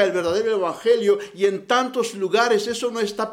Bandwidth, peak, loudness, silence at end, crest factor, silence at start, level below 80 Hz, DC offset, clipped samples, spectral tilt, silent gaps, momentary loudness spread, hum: 15.5 kHz; -4 dBFS; -21 LUFS; 0 s; 16 dB; 0 s; -64 dBFS; under 0.1%; under 0.1%; -3.5 dB/octave; none; 6 LU; none